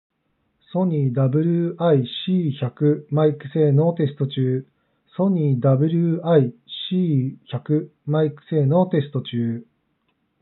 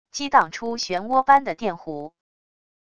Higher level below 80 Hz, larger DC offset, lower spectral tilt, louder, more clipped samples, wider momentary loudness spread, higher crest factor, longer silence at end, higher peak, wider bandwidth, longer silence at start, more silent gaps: second, -78 dBFS vs -60 dBFS; neither; first, -8 dB/octave vs -3 dB/octave; about the same, -21 LUFS vs -21 LUFS; neither; second, 8 LU vs 17 LU; about the same, 16 dB vs 20 dB; about the same, 0.8 s vs 0.8 s; about the same, -4 dBFS vs -2 dBFS; second, 4.2 kHz vs 8 kHz; first, 0.75 s vs 0.15 s; neither